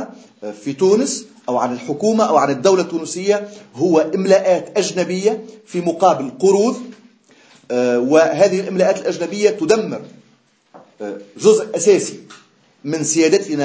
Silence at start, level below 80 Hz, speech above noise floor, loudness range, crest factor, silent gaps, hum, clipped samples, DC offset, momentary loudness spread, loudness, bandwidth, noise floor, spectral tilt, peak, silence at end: 0 s; -68 dBFS; 40 dB; 2 LU; 16 dB; none; none; under 0.1%; under 0.1%; 16 LU; -16 LUFS; 8 kHz; -56 dBFS; -4.5 dB/octave; 0 dBFS; 0 s